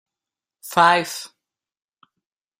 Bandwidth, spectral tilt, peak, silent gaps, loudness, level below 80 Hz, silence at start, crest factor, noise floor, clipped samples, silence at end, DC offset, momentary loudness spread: 16 kHz; -3 dB/octave; -2 dBFS; none; -18 LUFS; -70 dBFS; 0.65 s; 22 dB; -89 dBFS; under 0.1%; 1.35 s; under 0.1%; 25 LU